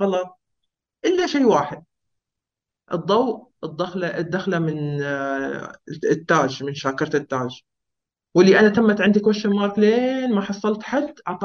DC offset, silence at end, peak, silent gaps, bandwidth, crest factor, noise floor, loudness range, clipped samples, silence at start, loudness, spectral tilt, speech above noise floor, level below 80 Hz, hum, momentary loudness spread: under 0.1%; 0 s; -2 dBFS; none; 7 kHz; 18 dB; -86 dBFS; 7 LU; under 0.1%; 0 s; -20 LUFS; -6 dB/octave; 66 dB; -62 dBFS; none; 12 LU